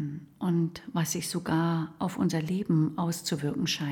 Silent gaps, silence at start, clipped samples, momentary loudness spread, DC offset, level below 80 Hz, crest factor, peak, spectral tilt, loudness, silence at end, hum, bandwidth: none; 0 s; under 0.1%; 5 LU; under 0.1%; -64 dBFS; 14 dB; -16 dBFS; -5.5 dB/octave; -30 LUFS; 0 s; none; 18 kHz